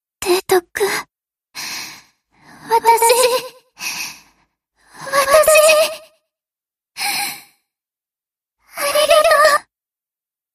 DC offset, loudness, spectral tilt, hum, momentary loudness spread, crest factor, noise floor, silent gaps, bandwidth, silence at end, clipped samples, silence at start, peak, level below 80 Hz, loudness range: under 0.1%; -15 LUFS; -0.5 dB/octave; none; 21 LU; 18 dB; under -90 dBFS; none; 15.5 kHz; 0.95 s; under 0.1%; 0.2 s; 0 dBFS; -56 dBFS; 4 LU